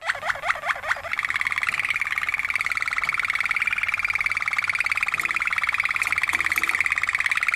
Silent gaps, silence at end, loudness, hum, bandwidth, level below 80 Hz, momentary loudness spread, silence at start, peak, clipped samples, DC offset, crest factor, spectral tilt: none; 0 s; -22 LUFS; none; 14.5 kHz; -56 dBFS; 4 LU; 0 s; -6 dBFS; under 0.1%; under 0.1%; 18 dB; -0.5 dB/octave